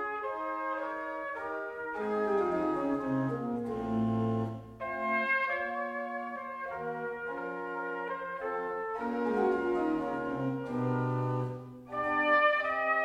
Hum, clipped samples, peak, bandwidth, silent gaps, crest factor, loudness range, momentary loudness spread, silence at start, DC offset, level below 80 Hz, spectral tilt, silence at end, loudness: none; under 0.1%; -14 dBFS; 11 kHz; none; 18 dB; 5 LU; 9 LU; 0 s; under 0.1%; -64 dBFS; -8 dB/octave; 0 s; -32 LUFS